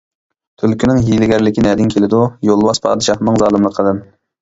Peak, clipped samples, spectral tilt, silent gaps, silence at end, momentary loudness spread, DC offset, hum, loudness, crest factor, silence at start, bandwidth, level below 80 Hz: 0 dBFS; under 0.1%; -6 dB/octave; none; 0.4 s; 5 LU; under 0.1%; none; -13 LUFS; 14 dB; 0.6 s; 8 kHz; -40 dBFS